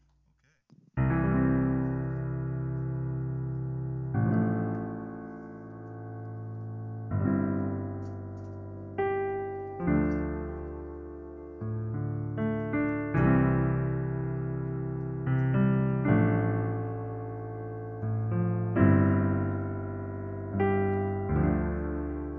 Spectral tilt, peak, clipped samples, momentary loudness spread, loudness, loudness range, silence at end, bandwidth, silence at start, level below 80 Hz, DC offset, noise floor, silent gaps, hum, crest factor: -12 dB/octave; -8 dBFS; under 0.1%; 15 LU; -30 LUFS; 6 LU; 0 s; 3.4 kHz; 0.95 s; -44 dBFS; under 0.1%; -69 dBFS; none; none; 20 dB